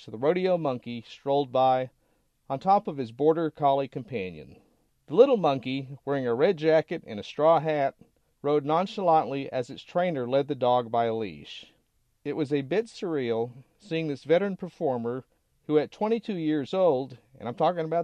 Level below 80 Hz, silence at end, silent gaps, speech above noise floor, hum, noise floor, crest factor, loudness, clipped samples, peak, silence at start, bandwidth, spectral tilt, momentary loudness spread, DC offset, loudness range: -70 dBFS; 0 s; none; 44 dB; none; -70 dBFS; 22 dB; -27 LUFS; under 0.1%; -6 dBFS; 0 s; 9 kHz; -7.5 dB/octave; 13 LU; under 0.1%; 4 LU